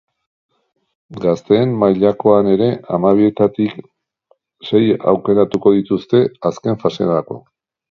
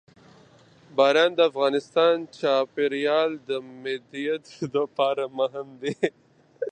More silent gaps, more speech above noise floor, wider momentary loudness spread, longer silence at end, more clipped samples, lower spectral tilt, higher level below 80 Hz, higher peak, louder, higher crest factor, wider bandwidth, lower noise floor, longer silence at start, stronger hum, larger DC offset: neither; first, 45 dB vs 30 dB; second, 8 LU vs 12 LU; first, 0.55 s vs 0 s; neither; first, -8.5 dB/octave vs -5 dB/octave; first, -54 dBFS vs -76 dBFS; first, 0 dBFS vs -6 dBFS; first, -15 LUFS vs -25 LUFS; about the same, 16 dB vs 20 dB; second, 7 kHz vs 9.2 kHz; first, -60 dBFS vs -54 dBFS; first, 1.1 s vs 0.95 s; neither; neither